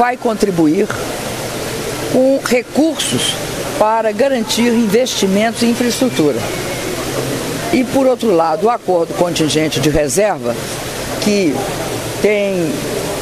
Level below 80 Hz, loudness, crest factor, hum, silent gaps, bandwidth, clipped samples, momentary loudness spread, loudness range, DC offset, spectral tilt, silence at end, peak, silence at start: -40 dBFS; -15 LUFS; 14 dB; none; none; 15.5 kHz; under 0.1%; 7 LU; 2 LU; under 0.1%; -4 dB/octave; 0 s; 0 dBFS; 0 s